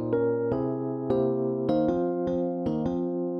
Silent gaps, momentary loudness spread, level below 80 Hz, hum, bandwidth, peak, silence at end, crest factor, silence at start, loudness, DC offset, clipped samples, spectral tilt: none; 3 LU; -54 dBFS; none; 6.4 kHz; -12 dBFS; 0 s; 14 dB; 0 s; -27 LUFS; under 0.1%; under 0.1%; -10.5 dB/octave